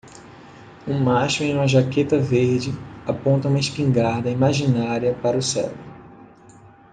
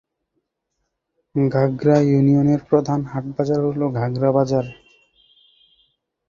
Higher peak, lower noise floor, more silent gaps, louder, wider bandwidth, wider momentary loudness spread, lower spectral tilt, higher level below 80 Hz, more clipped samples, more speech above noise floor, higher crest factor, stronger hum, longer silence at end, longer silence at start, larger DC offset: about the same, -4 dBFS vs -2 dBFS; second, -47 dBFS vs -76 dBFS; neither; about the same, -21 LUFS vs -19 LUFS; first, 9.6 kHz vs 7.2 kHz; about the same, 11 LU vs 9 LU; second, -6 dB/octave vs -9 dB/octave; about the same, -54 dBFS vs -54 dBFS; neither; second, 28 dB vs 58 dB; about the same, 18 dB vs 18 dB; neither; second, 0.7 s vs 1.55 s; second, 0.05 s vs 1.35 s; neither